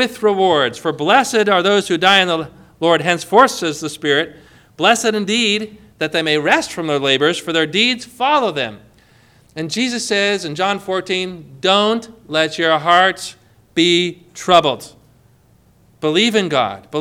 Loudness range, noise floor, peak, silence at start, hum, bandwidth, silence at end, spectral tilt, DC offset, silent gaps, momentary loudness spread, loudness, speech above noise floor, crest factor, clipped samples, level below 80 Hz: 4 LU; -52 dBFS; 0 dBFS; 0 s; none; 16.5 kHz; 0 s; -3.5 dB/octave; under 0.1%; none; 11 LU; -16 LUFS; 36 dB; 16 dB; under 0.1%; -58 dBFS